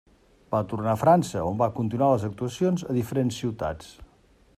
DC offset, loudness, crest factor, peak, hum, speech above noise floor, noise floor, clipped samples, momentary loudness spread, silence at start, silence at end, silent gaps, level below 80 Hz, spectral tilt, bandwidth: under 0.1%; -25 LUFS; 20 dB; -6 dBFS; none; 34 dB; -59 dBFS; under 0.1%; 10 LU; 0.5 s; 0.55 s; none; -54 dBFS; -7 dB/octave; 15 kHz